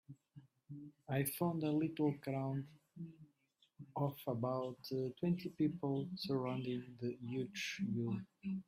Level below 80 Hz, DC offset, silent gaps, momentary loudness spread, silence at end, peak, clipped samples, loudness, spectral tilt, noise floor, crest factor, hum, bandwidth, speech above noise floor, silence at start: -78 dBFS; under 0.1%; none; 16 LU; 0.05 s; -24 dBFS; under 0.1%; -41 LUFS; -6.5 dB/octave; -77 dBFS; 18 dB; none; 15.5 kHz; 37 dB; 0.1 s